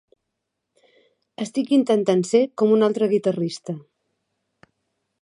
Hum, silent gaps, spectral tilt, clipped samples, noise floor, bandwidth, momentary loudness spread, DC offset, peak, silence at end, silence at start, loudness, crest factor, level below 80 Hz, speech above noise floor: none; none; -6.5 dB/octave; under 0.1%; -80 dBFS; 11 kHz; 14 LU; under 0.1%; -6 dBFS; 1.4 s; 1.4 s; -21 LUFS; 18 dB; -76 dBFS; 60 dB